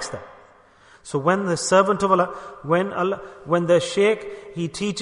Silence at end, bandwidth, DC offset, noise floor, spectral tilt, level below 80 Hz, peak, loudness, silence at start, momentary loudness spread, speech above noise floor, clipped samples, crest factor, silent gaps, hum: 0 s; 11 kHz; under 0.1%; -52 dBFS; -5 dB/octave; -58 dBFS; -4 dBFS; -21 LUFS; 0 s; 14 LU; 31 dB; under 0.1%; 18 dB; none; none